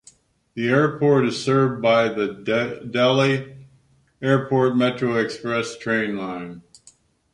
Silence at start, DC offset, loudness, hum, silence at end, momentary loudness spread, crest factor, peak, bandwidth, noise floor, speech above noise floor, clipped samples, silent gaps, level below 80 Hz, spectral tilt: 0.55 s; under 0.1%; -21 LUFS; none; 0.75 s; 10 LU; 18 dB; -4 dBFS; 11.5 kHz; -58 dBFS; 38 dB; under 0.1%; none; -62 dBFS; -6 dB/octave